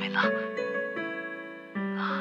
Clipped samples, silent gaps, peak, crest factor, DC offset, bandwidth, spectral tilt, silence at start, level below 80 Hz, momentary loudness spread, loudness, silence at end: under 0.1%; none; -12 dBFS; 18 dB; under 0.1%; 7.4 kHz; -6.5 dB/octave; 0 s; -90 dBFS; 11 LU; -31 LUFS; 0 s